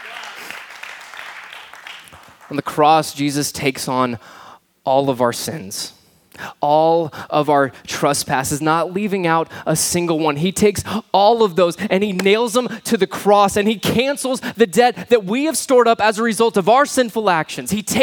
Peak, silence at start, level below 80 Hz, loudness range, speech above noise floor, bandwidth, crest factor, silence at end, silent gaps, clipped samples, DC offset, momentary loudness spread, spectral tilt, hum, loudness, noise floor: 0 dBFS; 0 s; -54 dBFS; 5 LU; 26 dB; 19.5 kHz; 18 dB; 0 s; none; under 0.1%; under 0.1%; 18 LU; -4 dB/octave; none; -17 LUFS; -42 dBFS